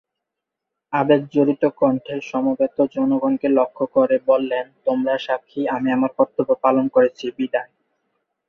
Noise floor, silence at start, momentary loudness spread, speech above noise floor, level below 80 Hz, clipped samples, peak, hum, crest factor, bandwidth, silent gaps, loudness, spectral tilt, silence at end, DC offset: -83 dBFS; 0.9 s; 7 LU; 64 dB; -66 dBFS; under 0.1%; -2 dBFS; none; 18 dB; 6.6 kHz; none; -20 LUFS; -7.5 dB/octave; 0.85 s; under 0.1%